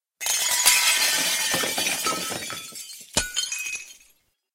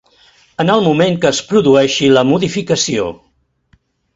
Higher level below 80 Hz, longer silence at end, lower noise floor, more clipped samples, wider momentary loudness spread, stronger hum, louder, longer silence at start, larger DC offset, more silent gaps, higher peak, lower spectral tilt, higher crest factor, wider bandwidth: about the same, -54 dBFS vs -50 dBFS; second, 0.6 s vs 1 s; first, -63 dBFS vs -56 dBFS; neither; first, 16 LU vs 8 LU; neither; second, -21 LUFS vs -13 LUFS; second, 0.2 s vs 0.6 s; neither; neither; about the same, -2 dBFS vs 0 dBFS; second, 0.5 dB/octave vs -4.5 dB/octave; first, 22 dB vs 14 dB; first, 16.5 kHz vs 8 kHz